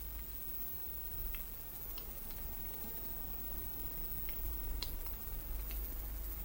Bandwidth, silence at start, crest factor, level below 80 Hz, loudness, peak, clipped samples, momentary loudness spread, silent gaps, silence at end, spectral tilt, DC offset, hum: 17 kHz; 0 s; 18 dB; -46 dBFS; -41 LUFS; -24 dBFS; under 0.1%; 4 LU; none; 0 s; -4 dB/octave; under 0.1%; none